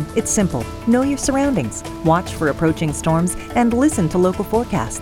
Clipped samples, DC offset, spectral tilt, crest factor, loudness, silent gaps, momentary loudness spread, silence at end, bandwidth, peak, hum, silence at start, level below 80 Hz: under 0.1%; 0.1%; -5.5 dB/octave; 16 dB; -18 LUFS; none; 5 LU; 0 s; 17 kHz; -4 dBFS; none; 0 s; -36 dBFS